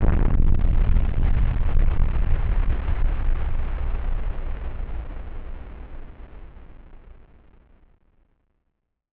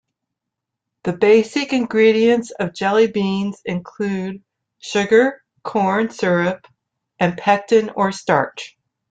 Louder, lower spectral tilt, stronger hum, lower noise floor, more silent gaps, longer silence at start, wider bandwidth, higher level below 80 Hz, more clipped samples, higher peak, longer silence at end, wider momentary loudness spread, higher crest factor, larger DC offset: second, -27 LUFS vs -18 LUFS; first, -8 dB/octave vs -5.5 dB/octave; neither; second, -75 dBFS vs -82 dBFS; neither; second, 0 s vs 1.05 s; second, 3.5 kHz vs 9.2 kHz; first, -22 dBFS vs -60 dBFS; neither; about the same, -4 dBFS vs -2 dBFS; first, 2.15 s vs 0.45 s; first, 20 LU vs 13 LU; about the same, 16 dB vs 18 dB; neither